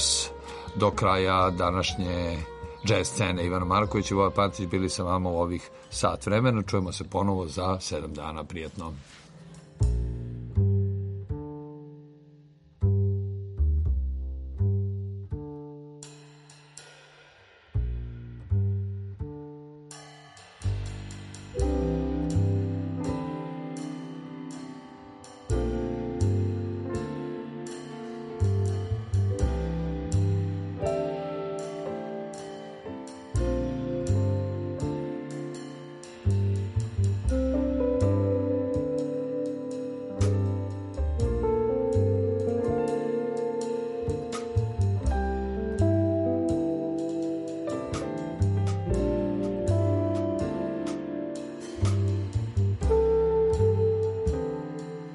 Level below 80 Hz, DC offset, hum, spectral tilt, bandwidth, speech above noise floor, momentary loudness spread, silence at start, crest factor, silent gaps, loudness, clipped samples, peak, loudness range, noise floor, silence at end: -38 dBFS; under 0.1%; none; -6 dB/octave; 11.5 kHz; 29 dB; 15 LU; 0 s; 18 dB; none; -29 LUFS; under 0.1%; -10 dBFS; 8 LU; -56 dBFS; 0 s